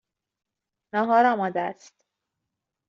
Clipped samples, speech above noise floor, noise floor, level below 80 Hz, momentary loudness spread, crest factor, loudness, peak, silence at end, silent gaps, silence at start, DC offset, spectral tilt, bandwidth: under 0.1%; 61 dB; -84 dBFS; -78 dBFS; 11 LU; 20 dB; -23 LUFS; -8 dBFS; 1.15 s; none; 0.95 s; under 0.1%; -4 dB/octave; 7.4 kHz